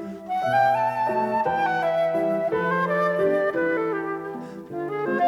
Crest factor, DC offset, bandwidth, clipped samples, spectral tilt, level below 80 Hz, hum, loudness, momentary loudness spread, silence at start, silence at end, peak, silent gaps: 14 dB; under 0.1%; 16 kHz; under 0.1%; -7 dB/octave; -64 dBFS; none; -23 LUFS; 10 LU; 0 s; 0 s; -10 dBFS; none